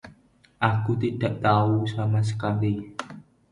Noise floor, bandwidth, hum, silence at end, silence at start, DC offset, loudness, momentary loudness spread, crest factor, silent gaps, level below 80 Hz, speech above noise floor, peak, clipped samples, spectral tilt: -57 dBFS; 10.5 kHz; none; 0.3 s; 0.05 s; under 0.1%; -25 LUFS; 12 LU; 20 dB; none; -54 dBFS; 34 dB; -6 dBFS; under 0.1%; -7.5 dB/octave